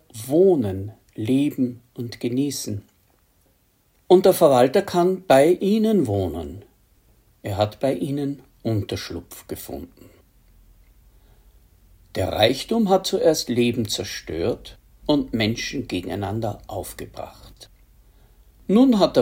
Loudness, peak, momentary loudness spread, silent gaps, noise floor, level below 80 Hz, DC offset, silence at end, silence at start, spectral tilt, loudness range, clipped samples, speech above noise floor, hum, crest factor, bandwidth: -21 LUFS; -2 dBFS; 19 LU; none; -62 dBFS; -52 dBFS; under 0.1%; 0 s; 0.15 s; -5.5 dB/octave; 12 LU; under 0.1%; 42 dB; none; 20 dB; 16.5 kHz